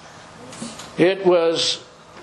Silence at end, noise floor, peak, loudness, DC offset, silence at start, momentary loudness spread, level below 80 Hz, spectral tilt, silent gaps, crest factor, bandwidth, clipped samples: 0 s; -41 dBFS; -2 dBFS; -19 LUFS; under 0.1%; 0.05 s; 19 LU; -62 dBFS; -4 dB/octave; none; 20 dB; 11.5 kHz; under 0.1%